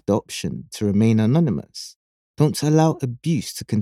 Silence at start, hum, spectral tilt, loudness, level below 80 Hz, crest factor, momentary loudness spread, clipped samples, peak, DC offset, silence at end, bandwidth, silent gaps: 0.1 s; none; -6.5 dB/octave; -21 LUFS; -56 dBFS; 18 dB; 12 LU; under 0.1%; -4 dBFS; under 0.1%; 0 s; 15.5 kHz; 1.96-2.34 s